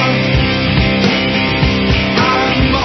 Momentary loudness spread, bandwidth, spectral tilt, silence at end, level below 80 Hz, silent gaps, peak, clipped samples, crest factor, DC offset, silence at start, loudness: 1 LU; 6.4 kHz; -6 dB/octave; 0 s; -24 dBFS; none; 0 dBFS; under 0.1%; 12 dB; under 0.1%; 0 s; -12 LUFS